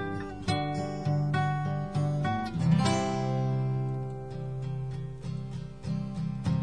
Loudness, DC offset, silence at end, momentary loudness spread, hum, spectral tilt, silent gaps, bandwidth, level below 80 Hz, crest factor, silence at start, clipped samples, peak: -31 LUFS; 0.3%; 0 s; 11 LU; none; -7 dB/octave; none; 10 kHz; -52 dBFS; 16 dB; 0 s; under 0.1%; -14 dBFS